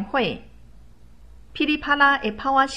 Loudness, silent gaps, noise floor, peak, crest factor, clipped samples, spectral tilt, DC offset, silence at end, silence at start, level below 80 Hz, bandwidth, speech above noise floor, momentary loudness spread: -21 LUFS; none; -49 dBFS; -4 dBFS; 20 dB; under 0.1%; -4 dB/octave; 0.4%; 0 s; 0 s; -48 dBFS; 15 kHz; 28 dB; 15 LU